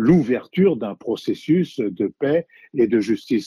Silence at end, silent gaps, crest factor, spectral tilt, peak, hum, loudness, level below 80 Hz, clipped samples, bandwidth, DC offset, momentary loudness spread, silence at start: 0 s; none; 16 dB; -8 dB/octave; -4 dBFS; none; -21 LUFS; -58 dBFS; under 0.1%; 12 kHz; under 0.1%; 8 LU; 0 s